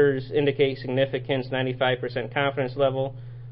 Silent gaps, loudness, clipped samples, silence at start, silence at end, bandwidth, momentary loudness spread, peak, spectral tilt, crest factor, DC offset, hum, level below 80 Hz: none; -25 LUFS; under 0.1%; 0 s; 0 s; 5.6 kHz; 5 LU; -8 dBFS; -10.5 dB/octave; 16 dB; under 0.1%; none; -54 dBFS